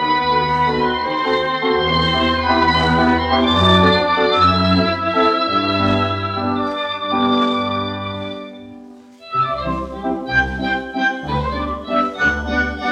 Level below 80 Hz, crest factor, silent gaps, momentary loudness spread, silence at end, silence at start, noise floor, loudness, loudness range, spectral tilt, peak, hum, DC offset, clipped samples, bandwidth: -38 dBFS; 16 dB; none; 10 LU; 0 s; 0 s; -40 dBFS; -17 LUFS; 7 LU; -6 dB/octave; -2 dBFS; none; under 0.1%; under 0.1%; 9.6 kHz